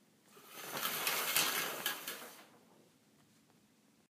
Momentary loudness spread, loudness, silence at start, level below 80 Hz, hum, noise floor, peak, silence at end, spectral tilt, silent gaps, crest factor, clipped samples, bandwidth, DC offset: 21 LU; -36 LUFS; 0.3 s; under -90 dBFS; none; -70 dBFS; -12 dBFS; 1.6 s; 0 dB/octave; none; 30 dB; under 0.1%; 16 kHz; under 0.1%